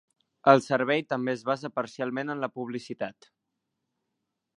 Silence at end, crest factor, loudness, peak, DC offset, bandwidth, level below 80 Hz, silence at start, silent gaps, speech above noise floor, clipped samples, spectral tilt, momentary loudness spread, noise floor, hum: 1.45 s; 28 dB; -28 LUFS; -2 dBFS; under 0.1%; 11 kHz; -78 dBFS; 0.45 s; none; 55 dB; under 0.1%; -6 dB/octave; 15 LU; -83 dBFS; none